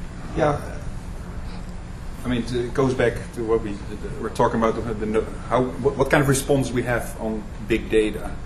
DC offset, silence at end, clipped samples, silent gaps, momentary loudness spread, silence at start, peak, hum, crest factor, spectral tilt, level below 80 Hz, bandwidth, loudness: under 0.1%; 0 s; under 0.1%; none; 15 LU; 0 s; -4 dBFS; none; 20 dB; -6 dB/octave; -34 dBFS; 14 kHz; -23 LUFS